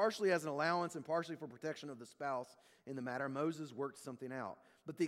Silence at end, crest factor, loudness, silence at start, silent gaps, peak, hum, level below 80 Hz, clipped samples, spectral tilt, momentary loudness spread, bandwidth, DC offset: 0 s; 20 dB; -41 LUFS; 0 s; none; -22 dBFS; none; -88 dBFS; under 0.1%; -5 dB/octave; 14 LU; 15.5 kHz; under 0.1%